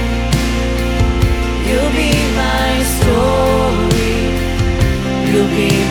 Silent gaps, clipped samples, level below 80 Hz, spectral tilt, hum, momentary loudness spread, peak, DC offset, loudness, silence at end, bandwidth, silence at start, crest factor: none; under 0.1%; -20 dBFS; -5.5 dB/octave; none; 4 LU; 0 dBFS; under 0.1%; -14 LUFS; 0 s; 18.5 kHz; 0 s; 12 dB